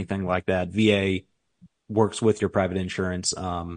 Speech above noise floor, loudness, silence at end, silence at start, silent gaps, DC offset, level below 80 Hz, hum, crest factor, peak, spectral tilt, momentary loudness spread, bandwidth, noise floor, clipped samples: 33 dB; -25 LUFS; 0 s; 0 s; none; under 0.1%; -58 dBFS; none; 20 dB; -6 dBFS; -5 dB/octave; 7 LU; 10.5 kHz; -58 dBFS; under 0.1%